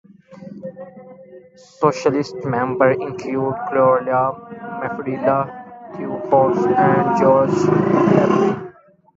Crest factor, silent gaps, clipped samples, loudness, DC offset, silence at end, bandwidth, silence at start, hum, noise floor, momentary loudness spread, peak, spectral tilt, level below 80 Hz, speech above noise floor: 18 dB; none; under 0.1%; -18 LUFS; under 0.1%; 0.45 s; 7.8 kHz; 0.3 s; none; -42 dBFS; 20 LU; 0 dBFS; -7.5 dB/octave; -56 dBFS; 25 dB